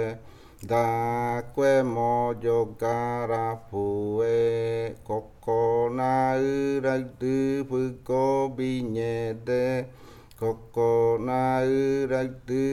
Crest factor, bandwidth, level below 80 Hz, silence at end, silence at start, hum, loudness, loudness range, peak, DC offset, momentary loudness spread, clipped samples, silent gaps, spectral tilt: 16 dB; 13.5 kHz; -54 dBFS; 0 s; 0 s; none; -26 LUFS; 2 LU; -10 dBFS; under 0.1%; 8 LU; under 0.1%; none; -7.5 dB/octave